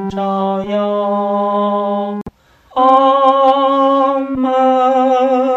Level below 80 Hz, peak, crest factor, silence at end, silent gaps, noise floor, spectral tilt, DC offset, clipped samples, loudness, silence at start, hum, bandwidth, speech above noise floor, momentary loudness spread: -52 dBFS; 0 dBFS; 14 dB; 0 s; none; -36 dBFS; -7 dB/octave; under 0.1%; under 0.1%; -13 LUFS; 0 s; none; 7.6 kHz; 21 dB; 8 LU